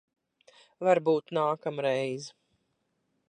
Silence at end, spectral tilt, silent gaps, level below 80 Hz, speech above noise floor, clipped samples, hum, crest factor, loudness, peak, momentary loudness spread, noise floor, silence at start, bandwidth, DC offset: 1 s; -5.5 dB/octave; none; -84 dBFS; 49 dB; under 0.1%; none; 20 dB; -28 LUFS; -10 dBFS; 11 LU; -77 dBFS; 0.8 s; 10 kHz; under 0.1%